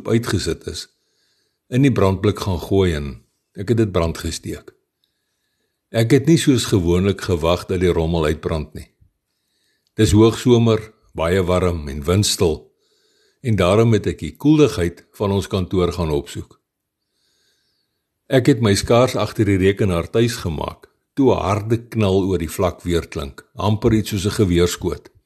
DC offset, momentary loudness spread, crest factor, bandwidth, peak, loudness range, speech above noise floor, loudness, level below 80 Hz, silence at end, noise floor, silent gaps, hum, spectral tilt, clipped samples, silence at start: under 0.1%; 14 LU; 18 dB; 13 kHz; -2 dBFS; 4 LU; 59 dB; -18 LUFS; -38 dBFS; 0.25 s; -77 dBFS; none; none; -6 dB/octave; under 0.1%; 0 s